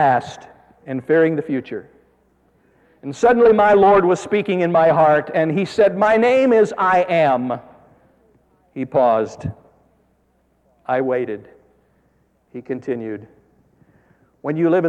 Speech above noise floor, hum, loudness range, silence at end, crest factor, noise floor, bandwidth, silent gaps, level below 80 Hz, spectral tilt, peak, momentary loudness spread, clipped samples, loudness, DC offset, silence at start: 45 dB; none; 13 LU; 0 s; 14 dB; -62 dBFS; 9.6 kHz; none; -56 dBFS; -7 dB/octave; -4 dBFS; 20 LU; under 0.1%; -17 LUFS; under 0.1%; 0 s